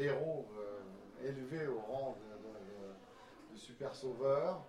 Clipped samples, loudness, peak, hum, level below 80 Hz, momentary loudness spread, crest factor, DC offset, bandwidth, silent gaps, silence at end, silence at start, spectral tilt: under 0.1%; -42 LUFS; -24 dBFS; none; -74 dBFS; 19 LU; 18 dB; under 0.1%; 12.5 kHz; none; 0 s; 0 s; -6.5 dB/octave